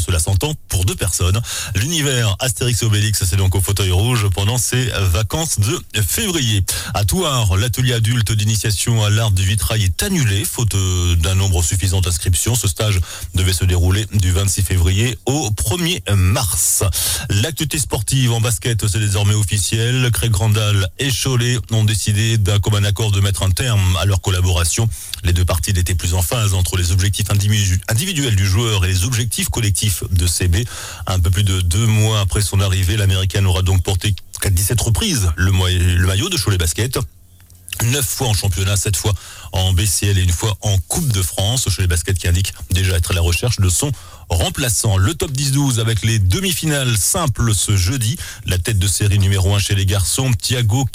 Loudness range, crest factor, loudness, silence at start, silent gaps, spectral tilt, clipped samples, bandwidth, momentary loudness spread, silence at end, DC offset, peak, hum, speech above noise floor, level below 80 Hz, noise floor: 1 LU; 10 dB; -17 LUFS; 0 s; none; -4 dB/octave; under 0.1%; 16 kHz; 4 LU; 0 s; under 0.1%; -6 dBFS; none; 28 dB; -30 dBFS; -44 dBFS